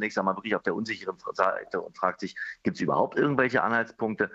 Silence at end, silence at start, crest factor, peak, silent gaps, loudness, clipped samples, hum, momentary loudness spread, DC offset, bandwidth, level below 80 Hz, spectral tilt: 0 s; 0 s; 22 dB; -6 dBFS; none; -28 LUFS; under 0.1%; none; 9 LU; under 0.1%; 8 kHz; -70 dBFS; -6 dB/octave